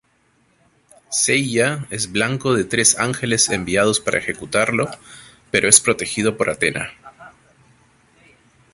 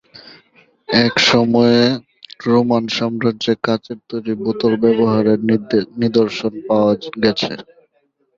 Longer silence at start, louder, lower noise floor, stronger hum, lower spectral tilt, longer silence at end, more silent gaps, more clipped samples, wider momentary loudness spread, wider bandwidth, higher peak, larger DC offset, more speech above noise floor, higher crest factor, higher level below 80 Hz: first, 1.1 s vs 0.15 s; about the same, -17 LUFS vs -16 LUFS; about the same, -61 dBFS vs -63 dBFS; neither; second, -2.5 dB/octave vs -5.5 dB/octave; first, 1.45 s vs 0.75 s; neither; neither; about the same, 11 LU vs 11 LU; first, 16 kHz vs 7.6 kHz; about the same, 0 dBFS vs 0 dBFS; neither; second, 42 dB vs 48 dB; about the same, 20 dB vs 16 dB; about the same, -52 dBFS vs -54 dBFS